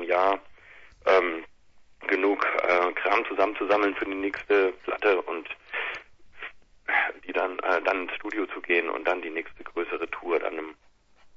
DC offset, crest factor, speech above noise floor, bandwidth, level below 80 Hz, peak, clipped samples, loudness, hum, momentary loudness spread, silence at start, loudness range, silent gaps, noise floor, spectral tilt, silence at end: under 0.1%; 20 dB; 31 dB; 7.2 kHz; -64 dBFS; -8 dBFS; under 0.1%; -26 LUFS; none; 13 LU; 0 s; 4 LU; none; -57 dBFS; -4.5 dB/octave; 0.1 s